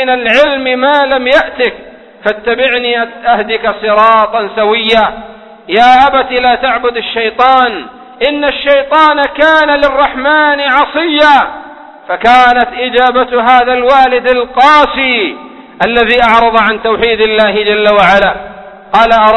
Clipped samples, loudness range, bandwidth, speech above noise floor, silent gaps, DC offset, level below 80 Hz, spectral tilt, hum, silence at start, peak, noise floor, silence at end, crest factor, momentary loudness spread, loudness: 0.8%; 3 LU; 11 kHz; 22 dB; none; under 0.1%; -38 dBFS; -4.5 dB/octave; none; 0 s; 0 dBFS; -30 dBFS; 0 s; 8 dB; 8 LU; -8 LUFS